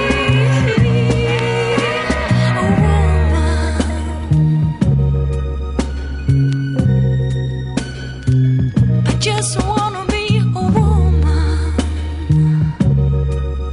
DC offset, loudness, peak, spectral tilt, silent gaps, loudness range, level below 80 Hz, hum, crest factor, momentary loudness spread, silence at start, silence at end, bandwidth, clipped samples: under 0.1%; -16 LUFS; -4 dBFS; -6.5 dB/octave; none; 2 LU; -22 dBFS; none; 12 dB; 8 LU; 0 s; 0 s; 11 kHz; under 0.1%